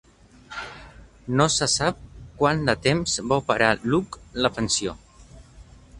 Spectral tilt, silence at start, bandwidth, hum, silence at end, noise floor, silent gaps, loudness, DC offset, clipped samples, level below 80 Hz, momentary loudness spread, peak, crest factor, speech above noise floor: -3.5 dB/octave; 0.5 s; 11.5 kHz; none; 0 s; -48 dBFS; none; -23 LUFS; under 0.1%; under 0.1%; -46 dBFS; 17 LU; -2 dBFS; 22 dB; 25 dB